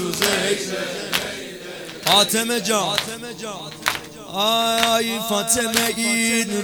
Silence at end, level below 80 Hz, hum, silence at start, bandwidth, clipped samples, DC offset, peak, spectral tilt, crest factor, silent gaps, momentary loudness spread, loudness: 0 s; -56 dBFS; none; 0 s; over 20 kHz; under 0.1%; under 0.1%; 0 dBFS; -2 dB/octave; 22 dB; none; 14 LU; -19 LUFS